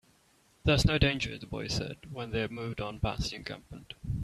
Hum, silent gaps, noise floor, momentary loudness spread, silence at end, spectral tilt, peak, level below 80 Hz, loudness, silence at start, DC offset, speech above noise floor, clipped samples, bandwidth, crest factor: none; none; -66 dBFS; 16 LU; 0 s; -5 dB/octave; -10 dBFS; -42 dBFS; -32 LUFS; 0.65 s; under 0.1%; 34 dB; under 0.1%; 14 kHz; 22 dB